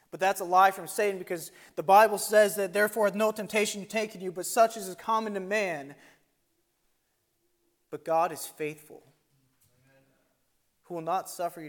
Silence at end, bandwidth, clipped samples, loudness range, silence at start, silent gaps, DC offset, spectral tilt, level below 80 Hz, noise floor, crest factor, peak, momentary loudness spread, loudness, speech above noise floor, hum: 0 s; 17.5 kHz; under 0.1%; 11 LU; 0.15 s; none; under 0.1%; -3 dB/octave; -80 dBFS; -75 dBFS; 20 dB; -8 dBFS; 15 LU; -27 LUFS; 48 dB; none